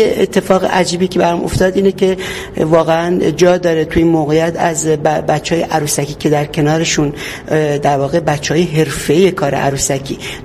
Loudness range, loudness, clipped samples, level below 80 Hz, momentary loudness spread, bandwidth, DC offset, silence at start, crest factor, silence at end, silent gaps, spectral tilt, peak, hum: 2 LU; -14 LUFS; under 0.1%; -36 dBFS; 4 LU; 15.5 kHz; under 0.1%; 0 s; 14 dB; 0 s; none; -5 dB/octave; 0 dBFS; none